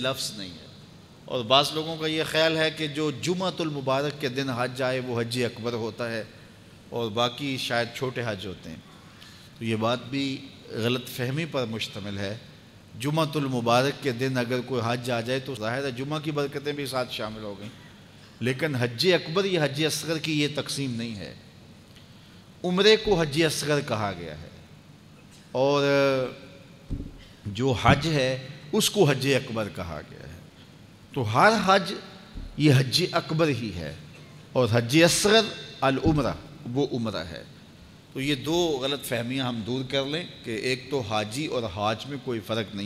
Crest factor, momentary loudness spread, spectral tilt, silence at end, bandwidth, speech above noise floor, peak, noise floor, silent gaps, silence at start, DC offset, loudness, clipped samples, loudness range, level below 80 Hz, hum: 24 dB; 17 LU; -4.5 dB/octave; 0 s; 16 kHz; 24 dB; -4 dBFS; -50 dBFS; none; 0 s; under 0.1%; -26 LUFS; under 0.1%; 6 LU; -52 dBFS; none